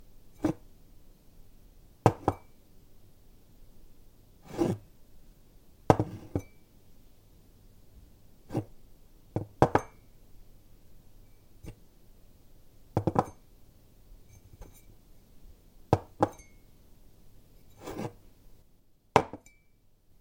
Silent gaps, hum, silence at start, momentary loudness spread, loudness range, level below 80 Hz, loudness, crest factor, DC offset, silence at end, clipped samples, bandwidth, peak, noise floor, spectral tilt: none; none; 0.25 s; 25 LU; 6 LU; -54 dBFS; -31 LUFS; 34 dB; under 0.1%; 0.85 s; under 0.1%; 16.5 kHz; -2 dBFS; -62 dBFS; -7 dB/octave